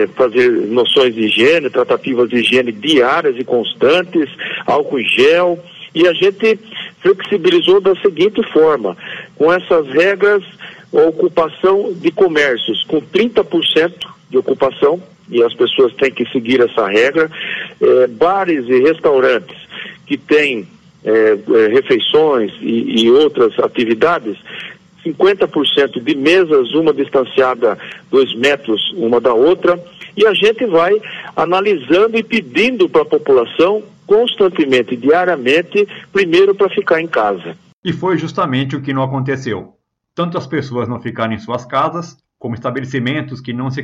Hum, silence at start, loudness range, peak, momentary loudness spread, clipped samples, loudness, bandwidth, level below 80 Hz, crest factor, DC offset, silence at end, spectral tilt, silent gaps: none; 0 s; 5 LU; -2 dBFS; 11 LU; under 0.1%; -13 LUFS; 10 kHz; -58 dBFS; 12 dB; under 0.1%; 0 s; -5.5 dB/octave; 37.73-37.83 s